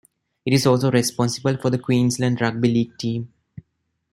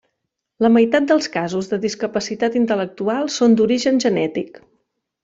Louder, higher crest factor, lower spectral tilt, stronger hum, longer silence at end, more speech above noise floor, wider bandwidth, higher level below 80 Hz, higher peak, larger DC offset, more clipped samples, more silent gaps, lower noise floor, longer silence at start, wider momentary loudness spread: second, -21 LUFS vs -18 LUFS; about the same, 18 dB vs 16 dB; about the same, -5.5 dB/octave vs -5 dB/octave; neither; about the same, 0.85 s vs 0.75 s; second, 54 dB vs 59 dB; first, 16 kHz vs 7.8 kHz; about the same, -58 dBFS vs -60 dBFS; about the same, -4 dBFS vs -2 dBFS; neither; neither; neither; second, -73 dBFS vs -77 dBFS; second, 0.45 s vs 0.6 s; about the same, 9 LU vs 8 LU